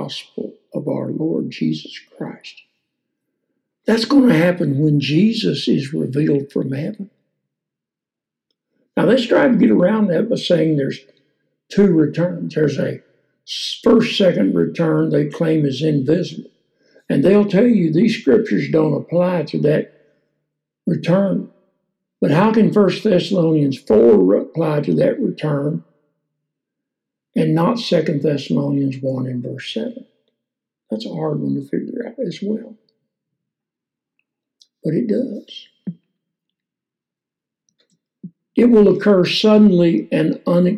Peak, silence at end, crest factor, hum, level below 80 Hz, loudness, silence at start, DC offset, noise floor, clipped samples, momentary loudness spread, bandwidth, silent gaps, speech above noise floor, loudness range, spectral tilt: -2 dBFS; 0 s; 14 dB; none; -58 dBFS; -17 LUFS; 0 s; under 0.1%; -86 dBFS; under 0.1%; 15 LU; 12 kHz; none; 70 dB; 11 LU; -7.5 dB/octave